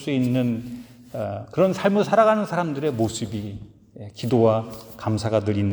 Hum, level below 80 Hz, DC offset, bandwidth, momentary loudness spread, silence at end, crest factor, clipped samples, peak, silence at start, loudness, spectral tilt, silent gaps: none; -54 dBFS; under 0.1%; over 20 kHz; 18 LU; 0 s; 18 dB; under 0.1%; -4 dBFS; 0 s; -22 LUFS; -7 dB/octave; none